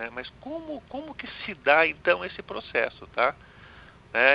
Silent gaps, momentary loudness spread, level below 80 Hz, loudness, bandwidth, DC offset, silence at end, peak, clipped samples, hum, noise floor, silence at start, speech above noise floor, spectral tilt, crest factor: none; 17 LU; -58 dBFS; -26 LUFS; 5.8 kHz; under 0.1%; 0 s; -4 dBFS; under 0.1%; none; -50 dBFS; 0 s; 22 dB; -6 dB/octave; 24 dB